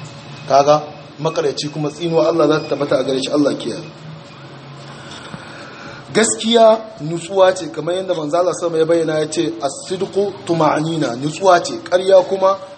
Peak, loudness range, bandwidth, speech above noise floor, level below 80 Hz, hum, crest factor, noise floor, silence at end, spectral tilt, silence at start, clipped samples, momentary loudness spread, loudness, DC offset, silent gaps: 0 dBFS; 6 LU; 8.8 kHz; 20 dB; -62 dBFS; none; 16 dB; -36 dBFS; 0 s; -4.5 dB/octave; 0 s; under 0.1%; 21 LU; -16 LUFS; under 0.1%; none